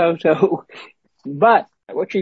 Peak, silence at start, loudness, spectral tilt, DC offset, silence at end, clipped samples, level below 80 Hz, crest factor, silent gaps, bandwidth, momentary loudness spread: -2 dBFS; 0 s; -17 LUFS; -7.5 dB/octave; under 0.1%; 0 s; under 0.1%; -68 dBFS; 16 dB; none; 7.6 kHz; 16 LU